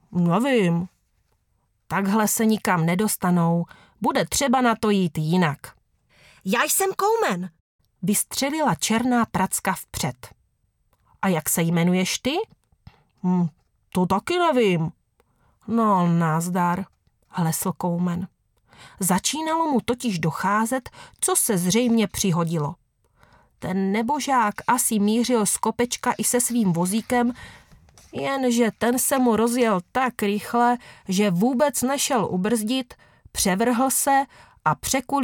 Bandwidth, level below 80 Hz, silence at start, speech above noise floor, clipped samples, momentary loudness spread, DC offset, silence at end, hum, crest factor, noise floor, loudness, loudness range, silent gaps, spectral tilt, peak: 19.5 kHz; -56 dBFS; 0.1 s; 47 dB; under 0.1%; 9 LU; under 0.1%; 0 s; none; 18 dB; -69 dBFS; -22 LUFS; 3 LU; 7.60-7.79 s; -4.5 dB/octave; -4 dBFS